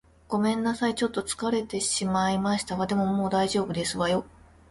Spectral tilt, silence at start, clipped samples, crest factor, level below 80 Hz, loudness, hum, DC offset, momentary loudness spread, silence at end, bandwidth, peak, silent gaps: -4.5 dB/octave; 0.3 s; under 0.1%; 14 dB; -54 dBFS; -27 LUFS; none; under 0.1%; 4 LU; 0.45 s; 11.5 kHz; -12 dBFS; none